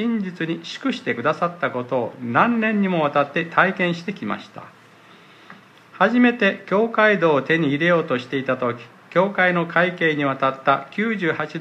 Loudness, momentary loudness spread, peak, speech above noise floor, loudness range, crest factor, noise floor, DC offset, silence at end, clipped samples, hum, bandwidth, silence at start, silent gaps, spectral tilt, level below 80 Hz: -20 LUFS; 9 LU; -2 dBFS; 28 dB; 4 LU; 20 dB; -48 dBFS; under 0.1%; 0 s; under 0.1%; none; 8.6 kHz; 0 s; none; -7 dB/octave; -70 dBFS